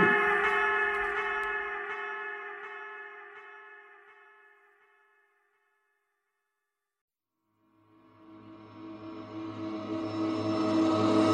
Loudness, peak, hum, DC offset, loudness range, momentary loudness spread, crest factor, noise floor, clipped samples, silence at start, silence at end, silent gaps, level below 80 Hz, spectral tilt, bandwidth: -30 LUFS; -12 dBFS; none; under 0.1%; 23 LU; 23 LU; 22 dB; -86 dBFS; under 0.1%; 0 s; 0 s; 7.01-7.08 s; -66 dBFS; -6 dB/octave; 10.5 kHz